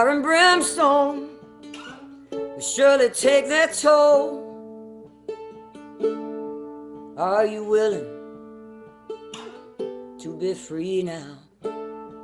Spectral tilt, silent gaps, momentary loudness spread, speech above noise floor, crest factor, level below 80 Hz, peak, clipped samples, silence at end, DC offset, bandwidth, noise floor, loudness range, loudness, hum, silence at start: -2.5 dB/octave; none; 24 LU; 25 dB; 20 dB; -66 dBFS; -2 dBFS; under 0.1%; 0 s; under 0.1%; 14.5 kHz; -44 dBFS; 12 LU; -20 LUFS; none; 0 s